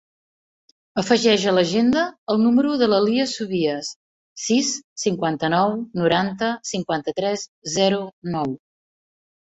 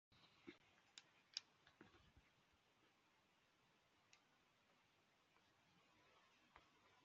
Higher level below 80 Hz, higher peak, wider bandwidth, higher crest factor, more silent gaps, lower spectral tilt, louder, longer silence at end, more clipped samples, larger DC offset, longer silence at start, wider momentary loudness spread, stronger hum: first, -60 dBFS vs under -90 dBFS; first, -4 dBFS vs -28 dBFS; first, 8.2 kHz vs 7.2 kHz; second, 18 dB vs 42 dB; first, 2.18-2.27 s, 3.96-4.36 s, 4.84-4.96 s, 7.48-7.62 s, 8.13-8.22 s vs none; first, -4.5 dB/octave vs -1 dB/octave; first, -21 LUFS vs -60 LUFS; first, 1 s vs 0 s; neither; neither; first, 0.95 s vs 0.1 s; about the same, 10 LU vs 11 LU; neither